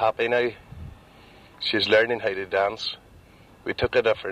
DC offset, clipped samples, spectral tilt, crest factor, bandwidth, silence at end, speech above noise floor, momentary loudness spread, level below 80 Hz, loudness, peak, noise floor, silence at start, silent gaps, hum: under 0.1%; under 0.1%; -5 dB/octave; 18 dB; 12 kHz; 0 s; 28 dB; 22 LU; -52 dBFS; -24 LUFS; -6 dBFS; -51 dBFS; 0 s; none; none